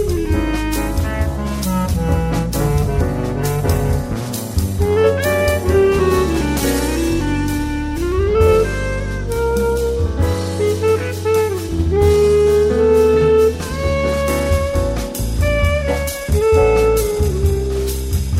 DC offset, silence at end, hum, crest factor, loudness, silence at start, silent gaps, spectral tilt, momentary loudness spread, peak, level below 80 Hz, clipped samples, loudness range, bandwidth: under 0.1%; 0 s; none; 14 dB; -17 LUFS; 0 s; none; -6 dB/octave; 8 LU; -2 dBFS; -24 dBFS; under 0.1%; 4 LU; 16.5 kHz